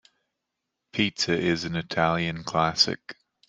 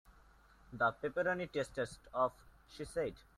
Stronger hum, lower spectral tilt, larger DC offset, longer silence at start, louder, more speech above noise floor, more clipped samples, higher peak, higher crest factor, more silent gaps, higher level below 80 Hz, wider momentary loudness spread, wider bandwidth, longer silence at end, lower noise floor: neither; about the same, -4 dB/octave vs -5 dB/octave; neither; first, 0.95 s vs 0.7 s; first, -25 LUFS vs -38 LUFS; first, 58 dB vs 26 dB; neither; first, -4 dBFS vs -20 dBFS; about the same, 22 dB vs 18 dB; neither; first, -58 dBFS vs -64 dBFS; about the same, 10 LU vs 12 LU; second, 9.8 kHz vs 13.5 kHz; first, 0.35 s vs 0.2 s; first, -83 dBFS vs -64 dBFS